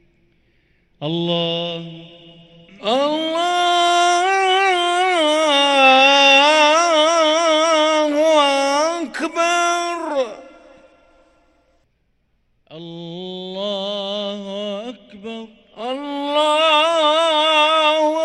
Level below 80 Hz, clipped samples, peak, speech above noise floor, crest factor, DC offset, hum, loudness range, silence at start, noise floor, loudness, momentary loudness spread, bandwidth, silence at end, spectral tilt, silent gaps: -64 dBFS; under 0.1%; 0 dBFS; 44 dB; 18 dB; under 0.1%; none; 16 LU; 1 s; -65 dBFS; -16 LUFS; 19 LU; 12 kHz; 0 s; -2.5 dB/octave; none